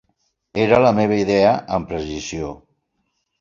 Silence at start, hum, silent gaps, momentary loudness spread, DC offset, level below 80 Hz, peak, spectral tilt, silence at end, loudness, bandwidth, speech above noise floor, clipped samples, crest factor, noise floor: 0.55 s; none; none; 14 LU; under 0.1%; -46 dBFS; -2 dBFS; -6 dB/octave; 0.85 s; -18 LUFS; 7.6 kHz; 54 dB; under 0.1%; 18 dB; -72 dBFS